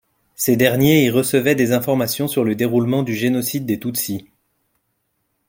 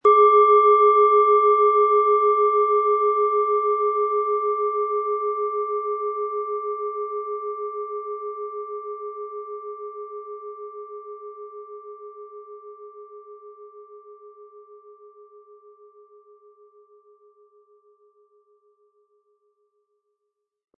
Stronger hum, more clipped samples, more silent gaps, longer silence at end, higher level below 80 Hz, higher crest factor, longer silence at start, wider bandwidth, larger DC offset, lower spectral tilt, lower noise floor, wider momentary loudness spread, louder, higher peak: neither; neither; neither; second, 1.25 s vs 6 s; first, -56 dBFS vs -84 dBFS; about the same, 18 dB vs 18 dB; first, 0.4 s vs 0.05 s; first, 17 kHz vs 3.5 kHz; neither; about the same, -5 dB/octave vs -5.5 dB/octave; second, -70 dBFS vs -80 dBFS; second, 8 LU vs 25 LU; about the same, -18 LUFS vs -20 LUFS; first, -2 dBFS vs -6 dBFS